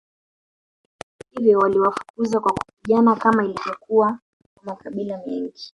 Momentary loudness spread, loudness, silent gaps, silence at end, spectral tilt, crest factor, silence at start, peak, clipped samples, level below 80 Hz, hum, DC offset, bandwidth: 19 LU; -20 LUFS; 2.10-2.14 s, 2.73-2.77 s, 4.22-4.40 s, 4.46-4.56 s; 0.05 s; -6.5 dB/octave; 18 dB; 1.35 s; -2 dBFS; under 0.1%; -60 dBFS; none; under 0.1%; 11 kHz